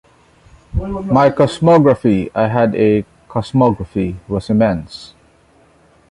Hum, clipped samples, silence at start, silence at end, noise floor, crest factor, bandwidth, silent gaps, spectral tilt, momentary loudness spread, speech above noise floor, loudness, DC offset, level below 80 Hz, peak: none; under 0.1%; 0.75 s; 1.05 s; -51 dBFS; 16 dB; 11 kHz; none; -8 dB/octave; 13 LU; 37 dB; -15 LUFS; under 0.1%; -36 dBFS; 0 dBFS